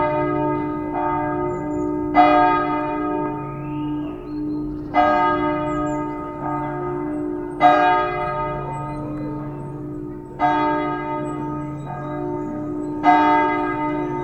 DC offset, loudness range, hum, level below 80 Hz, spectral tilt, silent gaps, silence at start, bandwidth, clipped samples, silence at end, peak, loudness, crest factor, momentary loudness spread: under 0.1%; 5 LU; none; -44 dBFS; -7.5 dB/octave; none; 0 s; 8.4 kHz; under 0.1%; 0 s; 0 dBFS; -21 LUFS; 20 dB; 13 LU